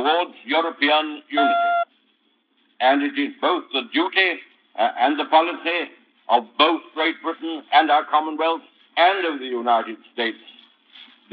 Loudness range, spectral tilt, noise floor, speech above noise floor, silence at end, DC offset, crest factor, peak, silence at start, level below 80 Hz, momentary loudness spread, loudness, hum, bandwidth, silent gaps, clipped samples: 2 LU; 2 dB/octave; -65 dBFS; 44 dB; 0.3 s; under 0.1%; 20 dB; -2 dBFS; 0 s; under -90 dBFS; 10 LU; -21 LUFS; none; 5.2 kHz; none; under 0.1%